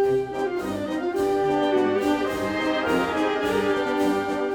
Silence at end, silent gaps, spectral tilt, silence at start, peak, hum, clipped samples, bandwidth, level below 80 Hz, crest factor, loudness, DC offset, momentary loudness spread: 0 s; none; -5.5 dB/octave; 0 s; -10 dBFS; none; under 0.1%; 19 kHz; -52 dBFS; 14 dB; -24 LUFS; under 0.1%; 5 LU